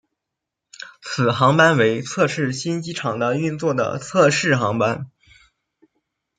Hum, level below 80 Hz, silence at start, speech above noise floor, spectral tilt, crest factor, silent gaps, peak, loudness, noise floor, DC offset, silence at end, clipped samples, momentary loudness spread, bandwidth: none; -62 dBFS; 0.8 s; 64 dB; -5 dB/octave; 18 dB; none; -2 dBFS; -19 LUFS; -83 dBFS; under 0.1%; 1.3 s; under 0.1%; 15 LU; 9.6 kHz